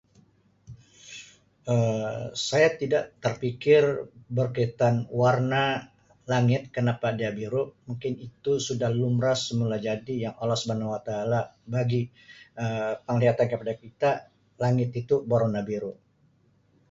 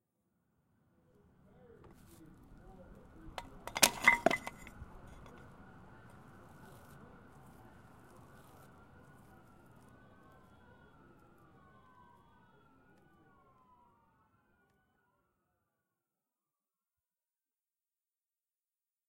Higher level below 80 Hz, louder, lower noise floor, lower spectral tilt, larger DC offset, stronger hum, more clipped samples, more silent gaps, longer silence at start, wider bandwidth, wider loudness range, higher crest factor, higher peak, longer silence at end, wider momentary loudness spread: about the same, -62 dBFS vs -66 dBFS; first, -27 LUFS vs -31 LUFS; second, -64 dBFS vs under -90 dBFS; first, -6 dB/octave vs -1.5 dB/octave; neither; neither; neither; neither; second, 0.7 s vs 2.8 s; second, 7.8 kHz vs 16 kHz; second, 4 LU vs 25 LU; second, 20 dB vs 38 dB; about the same, -8 dBFS vs -6 dBFS; second, 1 s vs 13.8 s; second, 11 LU vs 31 LU